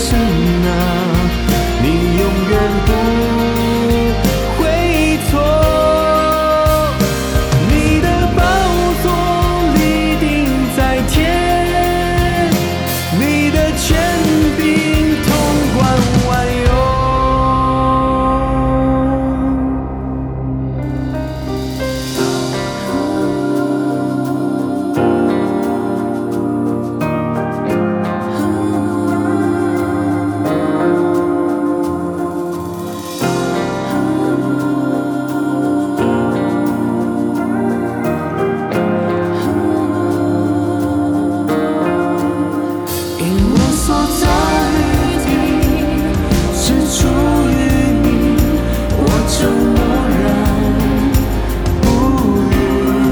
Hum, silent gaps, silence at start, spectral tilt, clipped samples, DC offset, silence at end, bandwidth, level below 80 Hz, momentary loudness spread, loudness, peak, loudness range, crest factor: none; none; 0 s; -6 dB/octave; under 0.1%; under 0.1%; 0 s; over 20 kHz; -24 dBFS; 6 LU; -15 LUFS; 0 dBFS; 4 LU; 14 dB